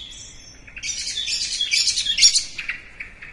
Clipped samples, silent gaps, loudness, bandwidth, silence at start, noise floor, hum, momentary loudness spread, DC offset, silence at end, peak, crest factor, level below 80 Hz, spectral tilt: under 0.1%; none; -18 LUFS; 11.5 kHz; 0 s; -42 dBFS; none; 23 LU; under 0.1%; 0 s; -2 dBFS; 22 dB; -48 dBFS; 3 dB/octave